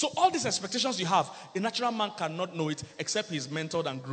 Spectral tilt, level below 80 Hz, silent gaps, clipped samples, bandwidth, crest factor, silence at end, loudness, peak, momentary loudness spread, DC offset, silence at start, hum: -3.5 dB/octave; -72 dBFS; none; under 0.1%; 9.2 kHz; 18 dB; 0 s; -30 LUFS; -12 dBFS; 7 LU; under 0.1%; 0 s; none